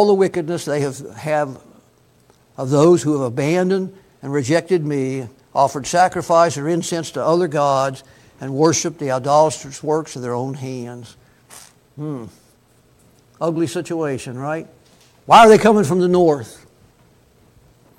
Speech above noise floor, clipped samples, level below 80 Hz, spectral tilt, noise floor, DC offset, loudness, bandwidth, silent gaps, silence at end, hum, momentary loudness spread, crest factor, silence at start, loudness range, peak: 37 dB; under 0.1%; -56 dBFS; -5.5 dB/octave; -54 dBFS; under 0.1%; -17 LUFS; 16 kHz; none; 1.45 s; none; 16 LU; 18 dB; 0 s; 12 LU; 0 dBFS